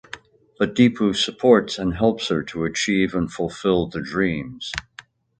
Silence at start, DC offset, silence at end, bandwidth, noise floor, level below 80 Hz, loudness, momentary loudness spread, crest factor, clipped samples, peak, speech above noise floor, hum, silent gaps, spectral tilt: 0.15 s; under 0.1%; 0.6 s; 9.2 kHz; -47 dBFS; -46 dBFS; -21 LUFS; 12 LU; 20 dB; under 0.1%; 0 dBFS; 27 dB; none; none; -5 dB/octave